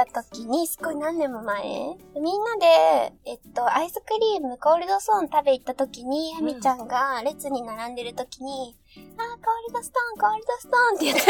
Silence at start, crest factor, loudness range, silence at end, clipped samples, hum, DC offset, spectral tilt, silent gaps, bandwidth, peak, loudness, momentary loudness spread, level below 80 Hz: 0 s; 24 dB; 7 LU; 0 s; under 0.1%; none; under 0.1%; -2.5 dB/octave; none; 19 kHz; 0 dBFS; -24 LUFS; 13 LU; -60 dBFS